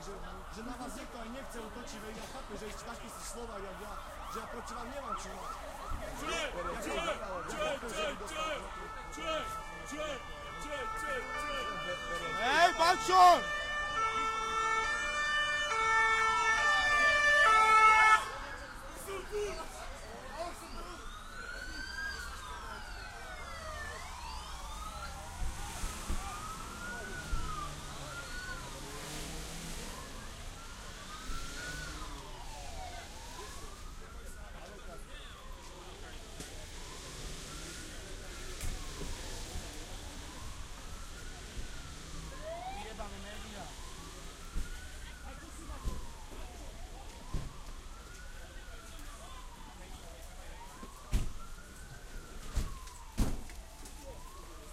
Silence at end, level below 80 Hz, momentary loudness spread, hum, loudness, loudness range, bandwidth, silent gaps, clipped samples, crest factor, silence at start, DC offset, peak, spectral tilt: 0 s; -46 dBFS; 22 LU; none; -34 LUFS; 20 LU; 16 kHz; none; under 0.1%; 26 dB; 0 s; under 0.1%; -12 dBFS; -2.5 dB/octave